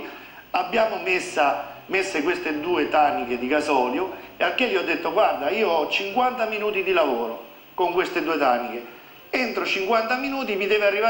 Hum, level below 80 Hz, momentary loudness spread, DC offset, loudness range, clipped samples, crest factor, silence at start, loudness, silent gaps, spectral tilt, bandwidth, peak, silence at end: none; -60 dBFS; 7 LU; under 0.1%; 2 LU; under 0.1%; 16 dB; 0 s; -23 LUFS; none; -3.5 dB/octave; 17 kHz; -8 dBFS; 0 s